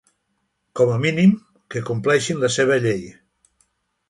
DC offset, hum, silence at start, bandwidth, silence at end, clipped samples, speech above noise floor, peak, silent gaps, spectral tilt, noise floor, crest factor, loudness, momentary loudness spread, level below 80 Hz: under 0.1%; none; 0.75 s; 11.5 kHz; 1 s; under 0.1%; 53 dB; -4 dBFS; none; -5.5 dB/octave; -72 dBFS; 18 dB; -19 LUFS; 14 LU; -58 dBFS